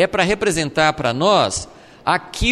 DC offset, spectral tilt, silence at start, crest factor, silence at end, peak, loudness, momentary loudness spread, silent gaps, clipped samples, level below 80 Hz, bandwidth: under 0.1%; -3.5 dB/octave; 0 s; 16 dB; 0 s; -2 dBFS; -18 LUFS; 10 LU; none; under 0.1%; -36 dBFS; 13.5 kHz